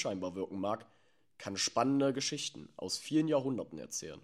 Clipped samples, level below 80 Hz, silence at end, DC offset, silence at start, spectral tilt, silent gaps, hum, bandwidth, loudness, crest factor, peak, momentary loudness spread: under 0.1%; -74 dBFS; 0.05 s; under 0.1%; 0 s; -4 dB/octave; none; none; 14 kHz; -35 LUFS; 18 dB; -18 dBFS; 11 LU